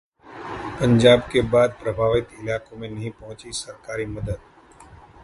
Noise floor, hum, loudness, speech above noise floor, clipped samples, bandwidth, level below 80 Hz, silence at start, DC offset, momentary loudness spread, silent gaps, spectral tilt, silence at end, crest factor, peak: -47 dBFS; none; -22 LUFS; 26 dB; under 0.1%; 11.5 kHz; -44 dBFS; 0.25 s; under 0.1%; 19 LU; none; -6 dB/octave; 0.85 s; 20 dB; -2 dBFS